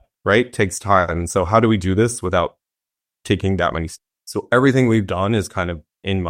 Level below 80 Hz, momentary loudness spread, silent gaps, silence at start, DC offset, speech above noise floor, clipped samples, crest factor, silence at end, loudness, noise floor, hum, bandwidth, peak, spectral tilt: -42 dBFS; 12 LU; none; 0.25 s; under 0.1%; 69 dB; under 0.1%; 18 dB; 0 s; -19 LUFS; -87 dBFS; none; 15.5 kHz; -2 dBFS; -5.5 dB/octave